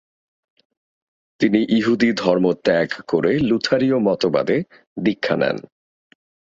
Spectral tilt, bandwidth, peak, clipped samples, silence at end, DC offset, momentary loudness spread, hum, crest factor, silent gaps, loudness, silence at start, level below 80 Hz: -6.5 dB/octave; 7.8 kHz; -2 dBFS; under 0.1%; 0.9 s; under 0.1%; 6 LU; none; 18 dB; 4.87-4.96 s; -19 LUFS; 1.4 s; -56 dBFS